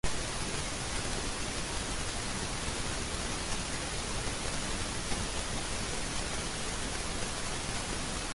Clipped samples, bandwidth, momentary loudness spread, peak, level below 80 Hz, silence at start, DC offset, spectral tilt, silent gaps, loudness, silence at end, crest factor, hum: under 0.1%; 11.5 kHz; 1 LU; -18 dBFS; -42 dBFS; 0.05 s; under 0.1%; -2.5 dB/octave; none; -35 LUFS; 0 s; 16 dB; none